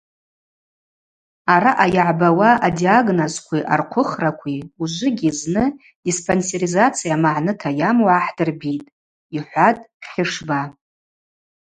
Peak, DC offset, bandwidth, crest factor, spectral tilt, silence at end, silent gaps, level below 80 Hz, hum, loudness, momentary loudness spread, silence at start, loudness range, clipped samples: 0 dBFS; under 0.1%; 9.6 kHz; 18 dB; -5 dB/octave; 0.9 s; 5.95-6.03 s, 8.92-9.30 s, 9.94-10.00 s; -54 dBFS; none; -18 LUFS; 12 LU; 1.45 s; 5 LU; under 0.1%